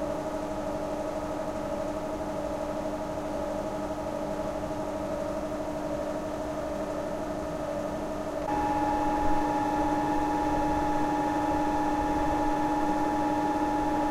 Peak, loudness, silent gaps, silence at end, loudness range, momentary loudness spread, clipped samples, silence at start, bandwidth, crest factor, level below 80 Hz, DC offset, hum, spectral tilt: -14 dBFS; -30 LUFS; none; 0 s; 5 LU; 6 LU; under 0.1%; 0 s; 15.5 kHz; 14 dB; -44 dBFS; under 0.1%; none; -6 dB/octave